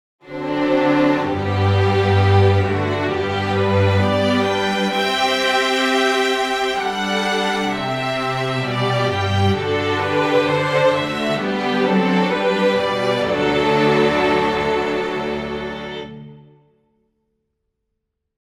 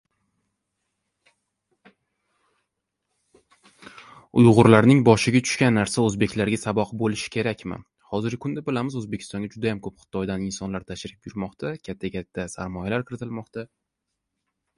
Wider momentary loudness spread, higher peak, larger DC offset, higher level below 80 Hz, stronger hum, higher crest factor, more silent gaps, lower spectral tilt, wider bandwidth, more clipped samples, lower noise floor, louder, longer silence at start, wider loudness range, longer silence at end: second, 6 LU vs 18 LU; second, -4 dBFS vs 0 dBFS; neither; about the same, -48 dBFS vs -52 dBFS; neither; second, 16 dB vs 24 dB; neither; about the same, -5.5 dB/octave vs -6 dB/octave; first, 13.5 kHz vs 11.5 kHz; neither; second, -76 dBFS vs -81 dBFS; first, -18 LUFS vs -23 LUFS; second, 0.25 s vs 3.95 s; second, 4 LU vs 13 LU; first, 2.05 s vs 1.1 s